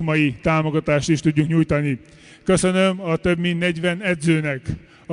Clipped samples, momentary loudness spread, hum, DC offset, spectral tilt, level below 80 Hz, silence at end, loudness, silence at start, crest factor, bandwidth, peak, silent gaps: under 0.1%; 9 LU; none; under 0.1%; -6 dB/octave; -44 dBFS; 0 s; -20 LUFS; 0 s; 14 dB; 10.5 kHz; -6 dBFS; none